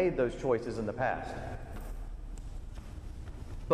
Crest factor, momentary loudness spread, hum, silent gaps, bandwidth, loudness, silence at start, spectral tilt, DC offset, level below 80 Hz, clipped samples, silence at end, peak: 22 dB; 15 LU; none; none; 14.5 kHz; -37 LUFS; 0 s; -7 dB/octave; under 0.1%; -44 dBFS; under 0.1%; 0 s; -12 dBFS